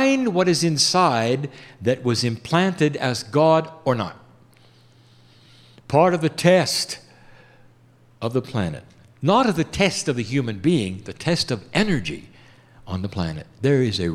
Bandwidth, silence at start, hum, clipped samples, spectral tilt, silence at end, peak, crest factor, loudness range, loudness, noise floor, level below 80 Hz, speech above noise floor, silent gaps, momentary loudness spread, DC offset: 15.5 kHz; 0 s; none; under 0.1%; -5 dB/octave; 0 s; -4 dBFS; 18 dB; 4 LU; -21 LUFS; -54 dBFS; -52 dBFS; 33 dB; none; 12 LU; under 0.1%